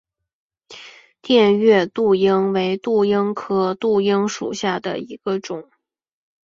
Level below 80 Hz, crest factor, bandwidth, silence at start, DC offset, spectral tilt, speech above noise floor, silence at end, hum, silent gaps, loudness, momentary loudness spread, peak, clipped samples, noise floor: -62 dBFS; 16 dB; 7.6 kHz; 0.7 s; under 0.1%; -5.5 dB/octave; 25 dB; 0.85 s; none; none; -18 LUFS; 13 LU; -2 dBFS; under 0.1%; -43 dBFS